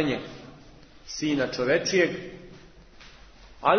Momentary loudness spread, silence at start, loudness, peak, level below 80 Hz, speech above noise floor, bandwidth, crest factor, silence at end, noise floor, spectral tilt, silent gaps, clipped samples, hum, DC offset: 25 LU; 0 s; -26 LUFS; -6 dBFS; -54 dBFS; 24 dB; 6.6 kHz; 22 dB; 0 s; -50 dBFS; -4.5 dB/octave; none; under 0.1%; none; under 0.1%